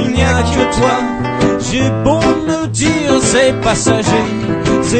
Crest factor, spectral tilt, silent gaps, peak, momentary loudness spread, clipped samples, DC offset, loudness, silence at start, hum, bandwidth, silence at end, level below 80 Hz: 12 dB; -5 dB/octave; none; 0 dBFS; 5 LU; under 0.1%; under 0.1%; -13 LUFS; 0 s; none; 9.2 kHz; 0 s; -28 dBFS